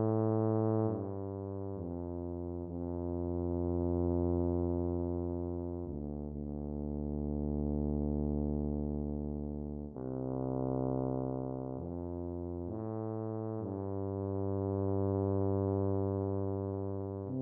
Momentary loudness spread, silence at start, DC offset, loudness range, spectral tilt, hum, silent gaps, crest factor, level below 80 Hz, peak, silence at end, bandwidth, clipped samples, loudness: 8 LU; 0 s; under 0.1%; 3 LU; -14 dB/octave; none; none; 16 dB; -48 dBFS; -20 dBFS; 0 s; 2 kHz; under 0.1%; -36 LUFS